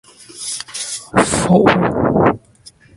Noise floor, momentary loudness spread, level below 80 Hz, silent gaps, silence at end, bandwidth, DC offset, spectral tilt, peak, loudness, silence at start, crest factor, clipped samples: -46 dBFS; 13 LU; -40 dBFS; none; 0.6 s; 11.5 kHz; under 0.1%; -5 dB/octave; 0 dBFS; -15 LUFS; 0.35 s; 16 dB; under 0.1%